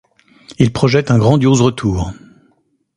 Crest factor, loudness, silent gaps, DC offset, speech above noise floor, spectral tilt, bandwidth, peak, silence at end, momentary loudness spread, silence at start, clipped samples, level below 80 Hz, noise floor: 14 dB; -14 LUFS; none; under 0.1%; 47 dB; -6.5 dB/octave; 11 kHz; 0 dBFS; 0.85 s; 9 LU; 0.5 s; under 0.1%; -36 dBFS; -59 dBFS